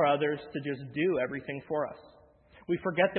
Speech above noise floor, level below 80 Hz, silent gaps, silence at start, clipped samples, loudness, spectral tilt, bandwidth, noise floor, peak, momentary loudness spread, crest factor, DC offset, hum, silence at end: 27 dB; -68 dBFS; none; 0 s; under 0.1%; -32 LUFS; -10 dB/octave; 4.4 kHz; -58 dBFS; -12 dBFS; 10 LU; 20 dB; under 0.1%; none; 0 s